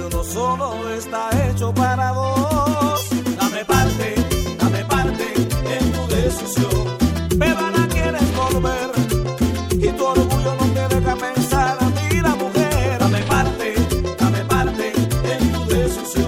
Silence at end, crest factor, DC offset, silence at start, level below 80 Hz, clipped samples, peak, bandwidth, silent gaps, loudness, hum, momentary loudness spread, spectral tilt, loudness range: 0 s; 16 dB; under 0.1%; 0 s; -28 dBFS; under 0.1%; -2 dBFS; 17 kHz; none; -19 LUFS; none; 3 LU; -5.5 dB/octave; 1 LU